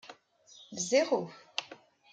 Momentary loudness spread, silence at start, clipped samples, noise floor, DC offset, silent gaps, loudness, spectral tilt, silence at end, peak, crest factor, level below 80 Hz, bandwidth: 22 LU; 0.05 s; under 0.1%; -59 dBFS; under 0.1%; none; -32 LUFS; -2.5 dB/octave; 0.4 s; -14 dBFS; 20 dB; -86 dBFS; 9.6 kHz